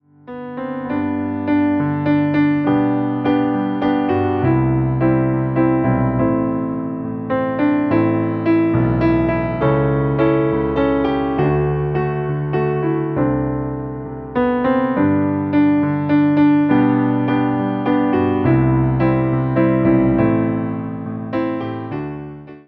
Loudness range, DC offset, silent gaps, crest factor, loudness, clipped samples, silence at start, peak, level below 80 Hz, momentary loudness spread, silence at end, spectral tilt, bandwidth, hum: 3 LU; under 0.1%; none; 14 dB; -17 LUFS; under 0.1%; 0.25 s; -2 dBFS; -38 dBFS; 9 LU; 0.1 s; -11.5 dB/octave; 4.9 kHz; none